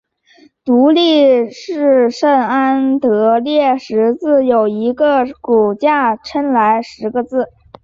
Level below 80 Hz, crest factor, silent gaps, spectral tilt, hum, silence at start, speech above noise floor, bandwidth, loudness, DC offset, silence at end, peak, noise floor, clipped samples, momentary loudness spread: -56 dBFS; 12 dB; none; -5.5 dB/octave; none; 0.65 s; 36 dB; 7.6 kHz; -13 LUFS; under 0.1%; 0.4 s; -2 dBFS; -48 dBFS; under 0.1%; 8 LU